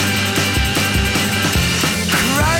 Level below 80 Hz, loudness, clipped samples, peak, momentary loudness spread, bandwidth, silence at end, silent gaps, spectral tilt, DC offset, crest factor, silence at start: -28 dBFS; -15 LUFS; under 0.1%; -6 dBFS; 1 LU; 18 kHz; 0 s; none; -3.5 dB/octave; under 0.1%; 10 dB; 0 s